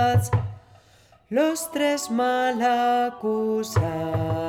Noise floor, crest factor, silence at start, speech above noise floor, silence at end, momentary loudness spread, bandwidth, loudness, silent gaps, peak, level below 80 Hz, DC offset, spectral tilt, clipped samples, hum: -56 dBFS; 14 dB; 0 s; 33 dB; 0 s; 5 LU; 17.5 kHz; -24 LUFS; none; -8 dBFS; -50 dBFS; under 0.1%; -5.5 dB/octave; under 0.1%; none